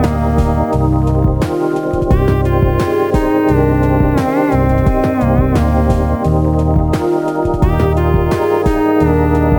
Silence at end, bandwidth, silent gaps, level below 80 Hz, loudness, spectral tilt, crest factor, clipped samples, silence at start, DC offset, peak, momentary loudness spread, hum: 0 s; 19 kHz; none; -20 dBFS; -14 LUFS; -8.5 dB/octave; 12 dB; under 0.1%; 0 s; 0.3%; 0 dBFS; 3 LU; none